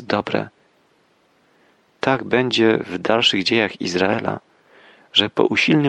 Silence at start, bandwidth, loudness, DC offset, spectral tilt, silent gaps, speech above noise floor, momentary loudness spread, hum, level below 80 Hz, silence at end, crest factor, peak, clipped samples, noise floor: 0 s; 9.8 kHz; -19 LUFS; under 0.1%; -4.5 dB/octave; none; 41 dB; 9 LU; none; -62 dBFS; 0 s; 18 dB; -2 dBFS; under 0.1%; -60 dBFS